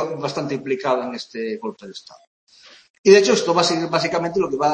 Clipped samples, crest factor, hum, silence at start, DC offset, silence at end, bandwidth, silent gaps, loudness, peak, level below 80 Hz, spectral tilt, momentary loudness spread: under 0.1%; 20 dB; none; 0 s; under 0.1%; 0 s; 8.8 kHz; 2.27-2.47 s, 2.90-3.04 s; -19 LUFS; 0 dBFS; -64 dBFS; -4 dB/octave; 17 LU